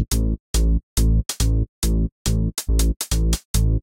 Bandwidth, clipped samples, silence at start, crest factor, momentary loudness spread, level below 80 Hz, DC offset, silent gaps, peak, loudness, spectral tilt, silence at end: 17 kHz; under 0.1%; 0 s; 14 dB; 2 LU; -20 dBFS; under 0.1%; 0.40-0.54 s, 0.83-0.96 s, 1.69-1.82 s, 2.12-2.25 s, 2.96-3.00 s, 3.45-3.54 s; -6 dBFS; -22 LUFS; -5 dB/octave; 0 s